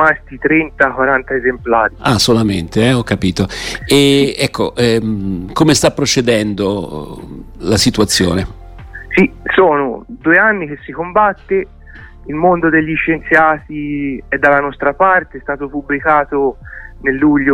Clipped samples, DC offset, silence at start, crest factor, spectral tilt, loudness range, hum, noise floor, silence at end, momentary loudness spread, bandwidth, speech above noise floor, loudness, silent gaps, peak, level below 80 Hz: under 0.1%; under 0.1%; 0 s; 14 dB; -4.5 dB/octave; 2 LU; none; -35 dBFS; 0 s; 12 LU; 16 kHz; 22 dB; -13 LUFS; none; 0 dBFS; -36 dBFS